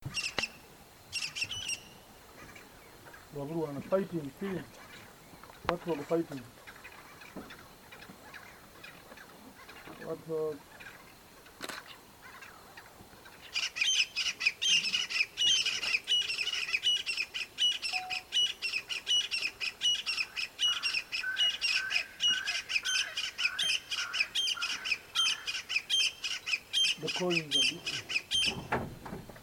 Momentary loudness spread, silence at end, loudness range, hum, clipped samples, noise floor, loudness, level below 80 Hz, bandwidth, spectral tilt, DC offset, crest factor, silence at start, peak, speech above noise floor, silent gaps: 23 LU; 0 s; 15 LU; none; under 0.1%; -55 dBFS; -30 LUFS; -64 dBFS; 19 kHz; -1 dB/octave; under 0.1%; 26 dB; 0 s; -8 dBFS; 21 dB; none